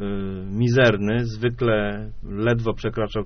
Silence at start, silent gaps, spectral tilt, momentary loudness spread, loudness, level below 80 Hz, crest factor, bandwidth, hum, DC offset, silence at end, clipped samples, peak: 0 s; none; -5.5 dB/octave; 12 LU; -22 LUFS; -38 dBFS; 18 dB; 6.6 kHz; none; under 0.1%; 0 s; under 0.1%; -4 dBFS